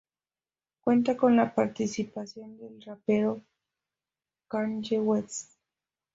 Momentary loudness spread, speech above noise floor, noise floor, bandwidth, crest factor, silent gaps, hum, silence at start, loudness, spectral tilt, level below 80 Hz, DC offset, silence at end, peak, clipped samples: 19 LU; over 62 dB; under -90 dBFS; 7.8 kHz; 18 dB; none; none; 0.85 s; -28 LUFS; -5.5 dB/octave; -70 dBFS; under 0.1%; 0.75 s; -12 dBFS; under 0.1%